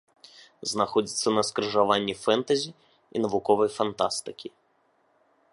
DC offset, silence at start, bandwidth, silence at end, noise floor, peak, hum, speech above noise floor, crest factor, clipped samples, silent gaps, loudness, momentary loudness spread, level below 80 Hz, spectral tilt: under 0.1%; 0.6 s; 11.5 kHz; 1.05 s; -67 dBFS; -6 dBFS; none; 42 dB; 22 dB; under 0.1%; none; -26 LUFS; 12 LU; -66 dBFS; -3.5 dB/octave